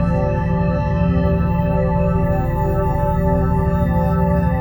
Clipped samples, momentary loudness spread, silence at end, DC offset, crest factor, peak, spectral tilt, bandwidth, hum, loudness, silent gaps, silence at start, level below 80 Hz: under 0.1%; 2 LU; 0 s; under 0.1%; 12 dB; -4 dBFS; -10 dB/octave; over 20 kHz; none; -18 LUFS; none; 0 s; -24 dBFS